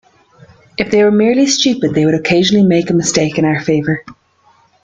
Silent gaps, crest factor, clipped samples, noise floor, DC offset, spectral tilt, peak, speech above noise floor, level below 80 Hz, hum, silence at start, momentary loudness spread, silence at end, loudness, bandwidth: none; 14 dB; under 0.1%; -52 dBFS; under 0.1%; -4.5 dB/octave; 0 dBFS; 40 dB; -48 dBFS; none; 0.8 s; 7 LU; 0.7 s; -12 LUFS; 9.4 kHz